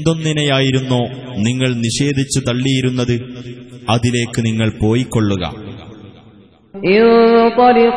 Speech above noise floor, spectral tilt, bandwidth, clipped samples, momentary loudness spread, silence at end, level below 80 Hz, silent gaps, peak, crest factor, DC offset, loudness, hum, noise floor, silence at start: 31 dB; -5.5 dB/octave; 11 kHz; under 0.1%; 15 LU; 0 s; -42 dBFS; none; 0 dBFS; 14 dB; under 0.1%; -15 LUFS; none; -45 dBFS; 0 s